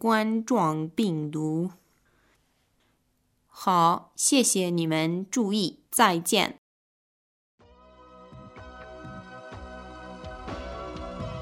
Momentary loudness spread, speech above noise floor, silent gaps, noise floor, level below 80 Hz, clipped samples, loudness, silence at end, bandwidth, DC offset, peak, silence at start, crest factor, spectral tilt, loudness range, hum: 21 LU; 46 dB; 6.58-7.58 s; -71 dBFS; -54 dBFS; under 0.1%; -25 LUFS; 0 s; 16 kHz; under 0.1%; -6 dBFS; 0 s; 24 dB; -4 dB/octave; 20 LU; none